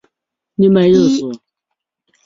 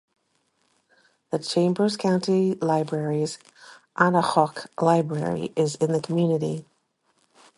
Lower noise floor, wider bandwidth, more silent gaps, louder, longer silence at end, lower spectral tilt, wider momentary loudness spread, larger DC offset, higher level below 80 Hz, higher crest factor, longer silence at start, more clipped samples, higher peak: first, -78 dBFS vs -70 dBFS; second, 7.6 kHz vs 11.5 kHz; neither; first, -12 LUFS vs -24 LUFS; about the same, 0.9 s vs 0.95 s; about the same, -7 dB/octave vs -6 dB/octave; first, 18 LU vs 9 LU; neither; first, -52 dBFS vs -68 dBFS; second, 14 dB vs 20 dB; second, 0.6 s vs 1.3 s; neither; about the same, -2 dBFS vs -4 dBFS